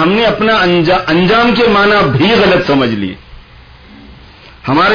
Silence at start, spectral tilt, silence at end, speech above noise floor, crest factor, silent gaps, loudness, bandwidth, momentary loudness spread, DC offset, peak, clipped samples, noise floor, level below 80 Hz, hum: 0 s; -6.5 dB/octave; 0 s; 28 dB; 10 dB; none; -10 LUFS; 5.4 kHz; 7 LU; under 0.1%; -2 dBFS; under 0.1%; -37 dBFS; -36 dBFS; none